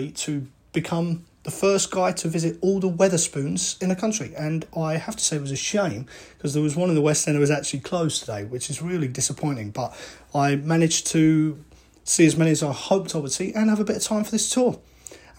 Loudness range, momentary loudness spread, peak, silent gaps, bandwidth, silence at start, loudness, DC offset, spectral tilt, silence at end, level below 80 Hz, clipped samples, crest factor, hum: 4 LU; 11 LU; -4 dBFS; none; 16.5 kHz; 0 s; -23 LUFS; under 0.1%; -4.5 dB/octave; 0.2 s; -56 dBFS; under 0.1%; 20 dB; none